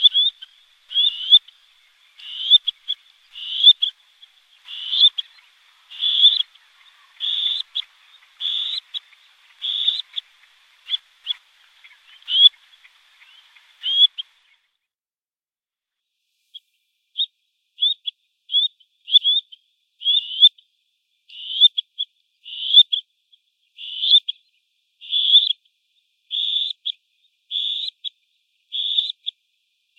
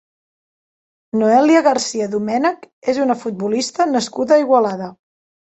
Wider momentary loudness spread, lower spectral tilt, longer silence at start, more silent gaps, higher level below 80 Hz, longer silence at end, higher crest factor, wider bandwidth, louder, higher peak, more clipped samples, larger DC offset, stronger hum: first, 19 LU vs 9 LU; second, 7 dB/octave vs -4.5 dB/octave; second, 0 s vs 1.15 s; second, none vs 2.73-2.82 s; second, -88 dBFS vs -64 dBFS; about the same, 0.7 s vs 0.65 s; first, 22 dB vs 16 dB; about the same, 8.6 kHz vs 8.2 kHz; about the same, -17 LUFS vs -17 LUFS; about the same, 0 dBFS vs -2 dBFS; neither; neither; neither